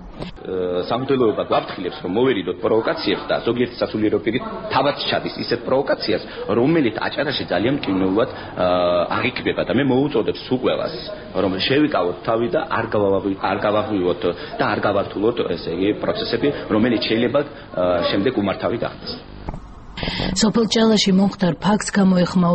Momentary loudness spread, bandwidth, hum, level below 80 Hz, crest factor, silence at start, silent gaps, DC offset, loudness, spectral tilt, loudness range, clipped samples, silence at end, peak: 8 LU; 8.2 kHz; none; -44 dBFS; 16 dB; 0 s; none; under 0.1%; -20 LUFS; -5.5 dB/octave; 1 LU; under 0.1%; 0 s; -4 dBFS